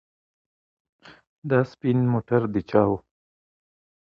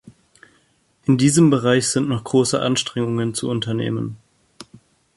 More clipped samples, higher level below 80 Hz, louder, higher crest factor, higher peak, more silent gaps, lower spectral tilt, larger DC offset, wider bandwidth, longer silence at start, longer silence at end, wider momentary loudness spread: neither; about the same, -56 dBFS vs -56 dBFS; second, -23 LUFS vs -19 LUFS; about the same, 20 dB vs 18 dB; about the same, -6 dBFS vs -4 dBFS; first, 1.27-1.42 s vs none; first, -10 dB/octave vs -5 dB/octave; neither; second, 6.4 kHz vs 11.5 kHz; first, 1.05 s vs 0.05 s; first, 1.2 s vs 0.55 s; second, 5 LU vs 10 LU